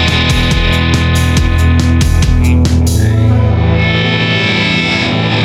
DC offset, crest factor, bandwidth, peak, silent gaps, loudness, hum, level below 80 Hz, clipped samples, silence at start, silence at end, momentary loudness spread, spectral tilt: under 0.1%; 10 dB; 14.5 kHz; 0 dBFS; none; -11 LUFS; none; -16 dBFS; under 0.1%; 0 s; 0 s; 1 LU; -5.5 dB/octave